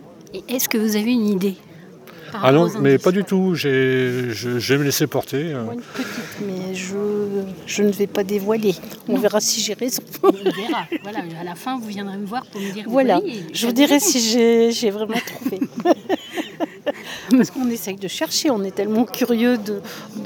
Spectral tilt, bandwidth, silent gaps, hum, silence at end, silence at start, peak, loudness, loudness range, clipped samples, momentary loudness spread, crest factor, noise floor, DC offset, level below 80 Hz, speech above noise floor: -4.5 dB/octave; 20 kHz; none; none; 0 s; 0 s; 0 dBFS; -20 LUFS; 5 LU; under 0.1%; 13 LU; 20 dB; -41 dBFS; under 0.1%; -66 dBFS; 22 dB